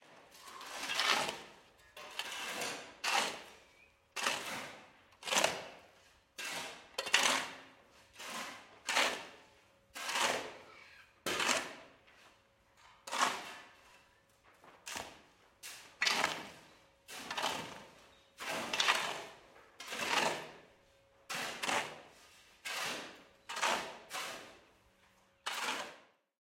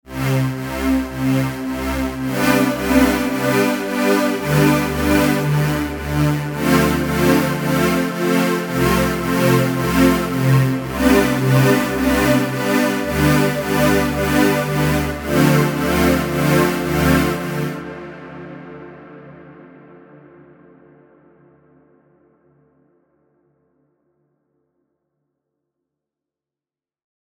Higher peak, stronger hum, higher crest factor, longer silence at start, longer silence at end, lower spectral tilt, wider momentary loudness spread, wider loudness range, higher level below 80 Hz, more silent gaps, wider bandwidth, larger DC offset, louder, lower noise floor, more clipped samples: second, -10 dBFS vs -2 dBFS; neither; first, 30 dB vs 18 dB; about the same, 0.05 s vs 0.1 s; second, 0.5 s vs 7.65 s; second, 0 dB/octave vs -6 dB/octave; first, 22 LU vs 7 LU; about the same, 5 LU vs 4 LU; second, -78 dBFS vs -36 dBFS; neither; second, 16.5 kHz vs over 20 kHz; neither; second, -36 LUFS vs -17 LUFS; second, -69 dBFS vs under -90 dBFS; neither